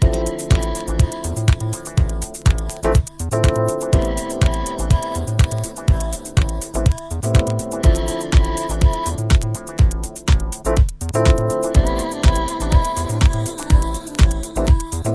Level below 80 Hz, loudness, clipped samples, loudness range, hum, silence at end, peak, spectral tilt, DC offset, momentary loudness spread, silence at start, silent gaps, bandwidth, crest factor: -20 dBFS; -19 LUFS; under 0.1%; 2 LU; none; 0 s; 0 dBFS; -5.5 dB/octave; under 0.1%; 5 LU; 0 s; none; 11 kHz; 16 dB